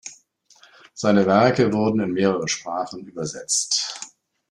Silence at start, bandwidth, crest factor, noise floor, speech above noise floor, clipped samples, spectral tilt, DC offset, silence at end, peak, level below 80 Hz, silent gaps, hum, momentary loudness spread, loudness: 0.05 s; 12.5 kHz; 20 dB; -56 dBFS; 35 dB; under 0.1%; -4 dB/octave; under 0.1%; 0.45 s; -4 dBFS; -60 dBFS; none; none; 17 LU; -21 LUFS